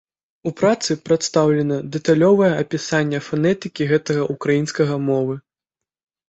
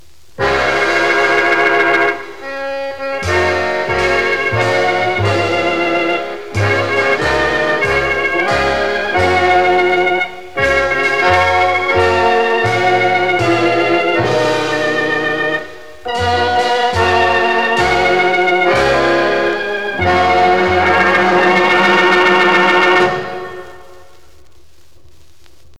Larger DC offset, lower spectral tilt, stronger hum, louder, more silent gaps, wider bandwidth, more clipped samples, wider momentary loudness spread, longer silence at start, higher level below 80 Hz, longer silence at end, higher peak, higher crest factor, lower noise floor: second, under 0.1% vs 2%; about the same, -5.5 dB/octave vs -4.5 dB/octave; neither; second, -19 LUFS vs -13 LUFS; neither; second, 8.2 kHz vs 13.5 kHz; neither; about the same, 7 LU vs 8 LU; about the same, 0.45 s vs 0.4 s; second, -58 dBFS vs -40 dBFS; first, 0.9 s vs 0 s; about the same, -2 dBFS vs 0 dBFS; about the same, 16 dB vs 14 dB; first, -86 dBFS vs -49 dBFS